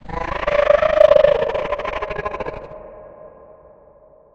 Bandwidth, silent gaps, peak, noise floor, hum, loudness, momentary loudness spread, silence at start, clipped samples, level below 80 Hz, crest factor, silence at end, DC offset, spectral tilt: 6.8 kHz; none; 0 dBFS; -49 dBFS; none; -17 LUFS; 19 LU; 0.05 s; under 0.1%; -38 dBFS; 20 dB; 1.05 s; under 0.1%; -5.5 dB/octave